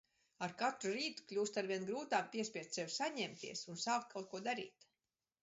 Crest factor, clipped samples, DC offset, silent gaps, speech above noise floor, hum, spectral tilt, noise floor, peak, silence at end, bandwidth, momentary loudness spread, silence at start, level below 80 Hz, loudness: 18 dB; under 0.1%; under 0.1%; none; over 48 dB; none; -2 dB/octave; under -90 dBFS; -24 dBFS; 0.75 s; 7.6 kHz; 7 LU; 0.4 s; -88 dBFS; -42 LUFS